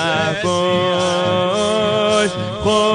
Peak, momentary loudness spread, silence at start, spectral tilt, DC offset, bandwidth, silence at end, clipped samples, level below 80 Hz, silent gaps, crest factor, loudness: -4 dBFS; 2 LU; 0 s; -4.5 dB/octave; under 0.1%; 10 kHz; 0 s; under 0.1%; -46 dBFS; none; 12 dB; -17 LUFS